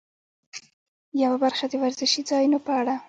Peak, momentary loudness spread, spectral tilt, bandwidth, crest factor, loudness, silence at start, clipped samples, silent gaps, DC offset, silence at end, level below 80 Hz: -10 dBFS; 19 LU; -2 dB/octave; 9 kHz; 16 dB; -23 LUFS; 0.55 s; under 0.1%; 0.73-1.12 s; under 0.1%; 0.05 s; -76 dBFS